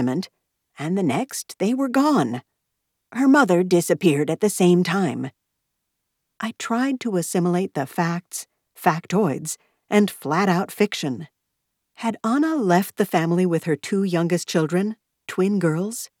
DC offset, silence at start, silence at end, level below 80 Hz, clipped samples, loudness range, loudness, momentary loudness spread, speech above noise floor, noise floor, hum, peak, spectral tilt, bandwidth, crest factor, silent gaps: under 0.1%; 0 s; 0.15 s; -80 dBFS; under 0.1%; 4 LU; -22 LUFS; 13 LU; 57 dB; -78 dBFS; none; -4 dBFS; -5.5 dB/octave; 17.5 kHz; 18 dB; none